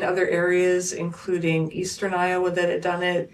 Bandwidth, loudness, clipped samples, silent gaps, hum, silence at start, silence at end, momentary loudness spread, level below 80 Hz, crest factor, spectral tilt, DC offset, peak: 13 kHz; -23 LUFS; under 0.1%; none; none; 0 s; 0.05 s; 7 LU; -62 dBFS; 14 dB; -5 dB/octave; under 0.1%; -8 dBFS